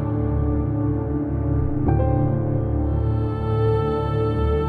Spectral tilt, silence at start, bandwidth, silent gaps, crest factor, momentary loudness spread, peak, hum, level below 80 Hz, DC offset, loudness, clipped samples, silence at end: -11 dB/octave; 0 s; 4.7 kHz; none; 14 dB; 3 LU; -6 dBFS; none; -28 dBFS; under 0.1%; -22 LUFS; under 0.1%; 0 s